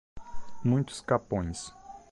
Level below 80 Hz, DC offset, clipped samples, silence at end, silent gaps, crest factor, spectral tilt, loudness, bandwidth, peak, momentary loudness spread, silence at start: -50 dBFS; under 0.1%; under 0.1%; 0.1 s; none; 18 dB; -6.5 dB/octave; -31 LUFS; 11.5 kHz; -12 dBFS; 22 LU; 0.15 s